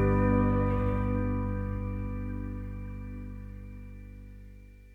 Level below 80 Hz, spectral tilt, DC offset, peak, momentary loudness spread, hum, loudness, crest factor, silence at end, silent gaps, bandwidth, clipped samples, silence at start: -38 dBFS; -10.5 dB/octave; under 0.1%; -16 dBFS; 22 LU; 50 Hz at -40 dBFS; -31 LUFS; 16 dB; 0 s; none; 3.7 kHz; under 0.1%; 0 s